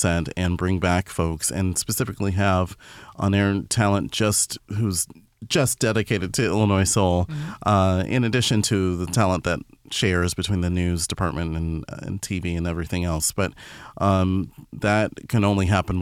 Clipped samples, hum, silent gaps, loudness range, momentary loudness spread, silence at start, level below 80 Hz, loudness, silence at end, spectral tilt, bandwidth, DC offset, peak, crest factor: under 0.1%; none; none; 4 LU; 8 LU; 0 s; -40 dBFS; -23 LUFS; 0 s; -5 dB/octave; 16 kHz; under 0.1%; -6 dBFS; 16 dB